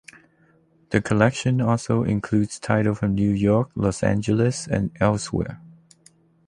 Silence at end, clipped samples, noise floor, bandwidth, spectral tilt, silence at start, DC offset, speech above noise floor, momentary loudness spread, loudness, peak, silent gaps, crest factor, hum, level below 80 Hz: 0.8 s; under 0.1%; -59 dBFS; 11 kHz; -6.5 dB/octave; 0.9 s; under 0.1%; 38 dB; 6 LU; -22 LUFS; -2 dBFS; none; 20 dB; none; -46 dBFS